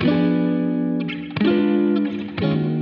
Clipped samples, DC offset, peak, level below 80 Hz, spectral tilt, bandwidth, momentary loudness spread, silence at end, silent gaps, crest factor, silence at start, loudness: under 0.1%; under 0.1%; -8 dBFS; -56 dBFS; -10 dB/octave; 5.6 kHz; 7 LU; 0 s; none; 12 dB; 0 s; -21 LUFS